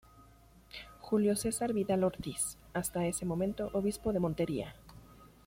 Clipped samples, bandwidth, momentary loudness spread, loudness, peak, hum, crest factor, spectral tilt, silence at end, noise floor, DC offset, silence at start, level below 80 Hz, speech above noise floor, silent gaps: under 0.1%; 16.5 kHz; 14 LU; -34 LUFS; -20 dBFS; none; 16 dB; -5.5 dB/octave; 0.2 s; -60 dBFS; under 0.1%; 0.15 s; -56 dBFS; 27 dB; none